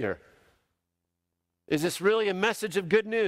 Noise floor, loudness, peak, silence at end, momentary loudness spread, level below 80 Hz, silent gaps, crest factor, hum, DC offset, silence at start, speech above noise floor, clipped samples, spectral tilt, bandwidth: -83 dBFS; -27 LUFS; -12 dBFS; 0 s; 8 LU; -68 dBFS; none; 18 dB; none; under 0.1%; 0 s; 57 dB; under 0.1%; -4.5 dB/octave; 16 kHz